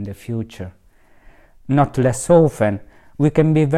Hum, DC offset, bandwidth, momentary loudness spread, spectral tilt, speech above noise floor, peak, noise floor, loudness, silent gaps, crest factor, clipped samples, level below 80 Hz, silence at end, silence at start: none; under 0.1%; 14 kHz; 17 LU; -7.5 dB/octave; 31 dB; 0 dBFS; -48 dBFS; -17 LUFS; none; 18 dB; under 0.1%; -46 dBFS; 0 s; 0 s